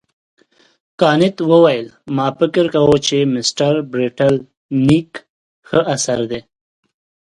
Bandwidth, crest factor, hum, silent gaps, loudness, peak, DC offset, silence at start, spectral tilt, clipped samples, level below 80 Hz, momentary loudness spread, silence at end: 11.5 kHz; 16 dB; none; 4.57-4.69 s, 5.29-5.63 s; -15 LUFS; 0 dBFS; under 0.1%; 1 s; -5 dB/octave; under 0.1%; -50 dBFS; 10 LU; 0.9 s